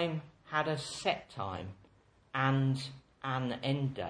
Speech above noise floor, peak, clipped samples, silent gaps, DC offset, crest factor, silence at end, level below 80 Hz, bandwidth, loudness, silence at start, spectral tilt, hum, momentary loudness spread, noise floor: 31 dB; -14 dBFS; under 0.1%; none; under 0.1%; 20 dB; 0 s; -68 dBFS; 10 kHz; -35 LUFS; 0 s; -6 dB/octave; none; 12 LU; -65 dBFS